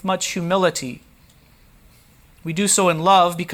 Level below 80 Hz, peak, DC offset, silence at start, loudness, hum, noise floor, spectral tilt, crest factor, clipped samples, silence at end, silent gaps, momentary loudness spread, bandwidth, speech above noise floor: -56 dBFS; -4 dBFS; under 0.1%; 0.05 s; -18 LUFS; none; -52 dBFS; -3.5 dB/octave; 18 dB; under 0.1%; 0 s; none; 19 LU; 19 kHz; 33 dB